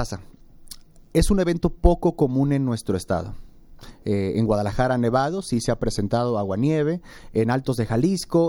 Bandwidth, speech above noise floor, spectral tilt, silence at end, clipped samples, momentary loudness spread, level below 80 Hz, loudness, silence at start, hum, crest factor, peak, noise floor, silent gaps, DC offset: 17.5 kHz; 21 dB; -6.5 dB/octave; 0 s; under 0.1%; 11 LU; -32 dBFS; -23 LUFS; 0 s; none; 20 dB; -2 dBFS; -43 dBFS; none; under 0.1%